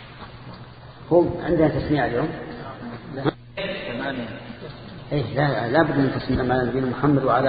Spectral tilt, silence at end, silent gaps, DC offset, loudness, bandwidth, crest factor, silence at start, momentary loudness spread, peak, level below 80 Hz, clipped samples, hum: -10.5 dB/octave; 0 s; none; under 0.1%; -23 LUFS; 5 kHz; 22 dB; 0 s; 20 LU; -2 dBFS; -44 dBFS; under 0.1%; none